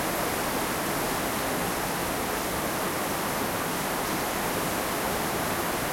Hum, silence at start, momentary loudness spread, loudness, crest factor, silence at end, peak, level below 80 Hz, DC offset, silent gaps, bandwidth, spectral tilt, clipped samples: none; 0 s; 1 LU; -28 LUFS; 14 dB; 0 s; -16 dBFS; -48 dBFS; under 0.1%; none; 16.5 kHz; -3 dB/octave; under 0.1%